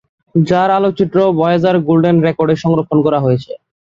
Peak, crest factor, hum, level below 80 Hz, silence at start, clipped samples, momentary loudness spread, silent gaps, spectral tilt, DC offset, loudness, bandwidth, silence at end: 0 dBFS; 12 dB; none; -50 dBFS; 0.35 s; under 0.1%; 5 LU; none; -8.5 dB/octave; under 0.1%; -13 LUFS; 7.4 kHz; 0.3 s